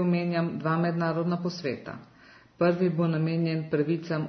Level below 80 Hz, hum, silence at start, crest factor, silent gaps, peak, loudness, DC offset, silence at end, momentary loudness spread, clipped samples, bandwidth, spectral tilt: -70 dBFS; none; 0 s; 14 dB; none; -12 dBFS; -28 LUFS; under 0.1%; 0 s; 8 LU; under 0.1%; 6.4 kHz; -8.5 dB/octave